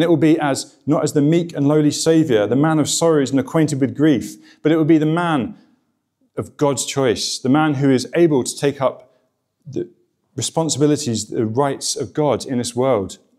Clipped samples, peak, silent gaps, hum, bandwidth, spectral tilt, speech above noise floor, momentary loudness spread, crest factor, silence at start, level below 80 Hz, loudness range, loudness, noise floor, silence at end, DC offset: under 0.1%; -4 dBFS; none; none; 14.5 kHz; -5.5 dB/octave; 49 dB; 9 LU; 14 dB; 0 s; -60 dBFS; 5 LU; -18 LUFS; -66 dBFS; 0.25 s; under 0.1%